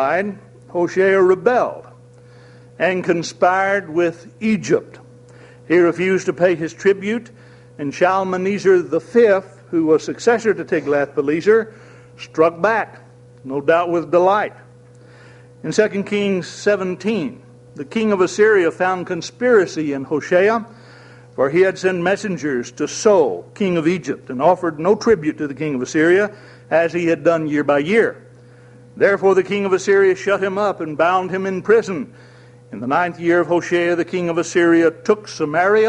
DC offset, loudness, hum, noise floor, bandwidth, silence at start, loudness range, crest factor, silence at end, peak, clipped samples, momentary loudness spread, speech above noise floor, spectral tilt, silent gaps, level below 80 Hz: under 0.1%; -18 LUFS; none; -44 dBFS; 10.5 kHz; 0 s; 3 LU; 18 dB; 0 s; 0 dBFS; under 0.1%; 10 LU; 27 dB; -5.5 dB/octave; none; -60 dBFS